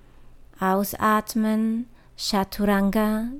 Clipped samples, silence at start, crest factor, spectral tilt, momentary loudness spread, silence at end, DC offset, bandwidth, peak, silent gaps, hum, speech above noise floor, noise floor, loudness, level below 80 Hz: under 0.1%; 0.2 s; 16 dB; -5 dB/octave; 7 LU; 0 s; under 0.1%; 17 kHz; -8 dBFS; none; none; 24 dB; -47 dBFS; -23 LUFS; -44 dBFS